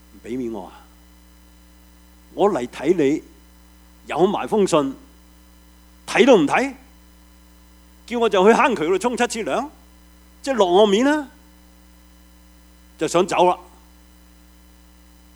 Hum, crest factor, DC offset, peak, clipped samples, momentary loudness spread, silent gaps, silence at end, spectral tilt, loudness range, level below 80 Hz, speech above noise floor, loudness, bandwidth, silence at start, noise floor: none; 20 dB; under 0.1%; -2 dBFS; under 0.1%; 17 LU; none; 1.75 s; -4.5 dB/octave; 6 LU; -50 dBFS; 31 dB; -19 LUFS; over 20 kHz; 0.25 s; -49 dBFS